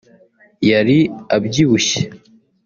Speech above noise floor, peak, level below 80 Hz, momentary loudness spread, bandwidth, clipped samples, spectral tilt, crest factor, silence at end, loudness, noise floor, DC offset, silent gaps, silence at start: 35 dB; -2 dBFS; -52 dBFS; 7 LU; 7.4 kHz; under 0.1%; -5 dB/octave; 14 dB; 0.5 s; -15 LUFS; -50 dBFS; under 0.1%; none; 0.6 s